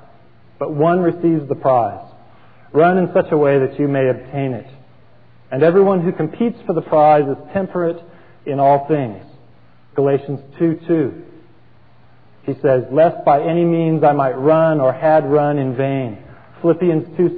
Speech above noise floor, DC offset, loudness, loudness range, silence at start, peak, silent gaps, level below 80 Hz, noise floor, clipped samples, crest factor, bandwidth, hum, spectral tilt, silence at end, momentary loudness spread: 35 dB; 0.5%; -16 LUFS; 5 LU; 0.6 s; -2 dBFS; none; -60 dBFS; -50 dBFS; under 0.1%; 14 dB; 4.8 kHz; none; -12 dB/octave; 0 s; 12 LU